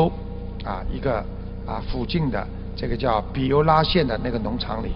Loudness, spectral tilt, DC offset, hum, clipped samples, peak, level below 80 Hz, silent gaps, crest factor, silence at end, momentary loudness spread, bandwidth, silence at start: -24 LUFS; -9.5 dB/octave; under 0.1%; 60 Hz at -35 dBFS; under 0.1%; -2 dBFS; -32 dBFS; none; 20 dB; 0 s; 15 LU; 5.6 kHz; 0 s